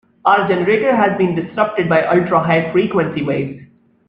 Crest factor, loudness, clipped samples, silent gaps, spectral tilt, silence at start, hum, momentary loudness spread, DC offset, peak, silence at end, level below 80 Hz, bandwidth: 16 dB; -15 LUFS; under 0.1%; none; -9 dB/octave; 0.25 s; none; 6 LU; under 0.1%; 0 dBFS; 0.45 s; -54 dBFS; 5.4 kHz